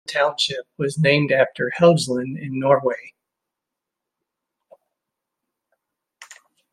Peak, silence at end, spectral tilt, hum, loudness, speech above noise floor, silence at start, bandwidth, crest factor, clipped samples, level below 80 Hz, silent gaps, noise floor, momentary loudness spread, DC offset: -2 dBFS; 0.4 s; -5 dB/octave; none; -20 LUFS; 65 dB; 0.1 s; 13 kHz; 20 dB; under 0.1%; -66 dBFS; none; -84 dBFS; 10 LU; under 0.1%